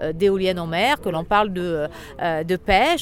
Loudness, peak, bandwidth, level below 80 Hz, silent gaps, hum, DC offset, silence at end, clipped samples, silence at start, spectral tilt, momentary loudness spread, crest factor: -21 LUFS; -4 dBFS; 16.5 kHz; -40 dBFS; none; none; under 0.1%; 0 s; under 0.1%; 0 s; -5 dB/octave; 8 LU; 16 dB